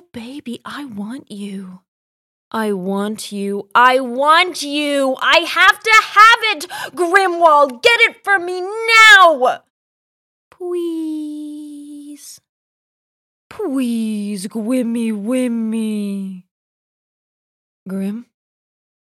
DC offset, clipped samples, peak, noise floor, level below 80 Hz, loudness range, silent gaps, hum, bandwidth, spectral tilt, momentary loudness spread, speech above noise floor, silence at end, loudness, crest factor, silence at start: under 0.1%; 0.3%; 0 dBFS; -36 dBFS; -62 dBFS; 17 LU; 1.88-2.51 s, 9.70-10.51 s, 12.49-13.50 s, 16.51-17.86 s; none; 16.5 kHz; -3 dB/octave; 21 LU; 21 dB; 0.95 s; -13 LUFS; 16 dB; 0.15 s